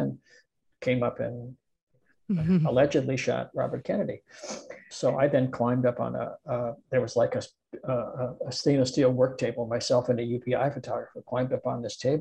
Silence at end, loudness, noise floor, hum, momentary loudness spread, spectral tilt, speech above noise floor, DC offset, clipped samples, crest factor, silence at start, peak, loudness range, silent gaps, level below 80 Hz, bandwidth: 0 s; -28 LUFS; -63 dBFS; none; 11 LU; -6.5 dB/octave; 36 dB; under 0.1%; under 0.1%; 18 dB; 0 s; -10 dBFS; 2 LU; 1.82-1.87 s; -60 dBFS; 9.8 kHz